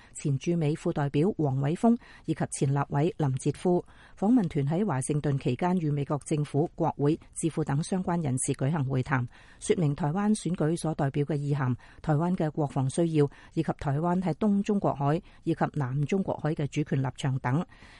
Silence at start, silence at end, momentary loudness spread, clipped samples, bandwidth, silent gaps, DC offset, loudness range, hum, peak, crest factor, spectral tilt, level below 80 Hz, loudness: 0.15 s; 0.15 s; 5 LU; under 0.1%; 11.5 kHz; none; under 0.1%; 1 LU; none; -12 dBFS; 16 dB; -7 dB/octave; -54 dBFS; -28 LUFS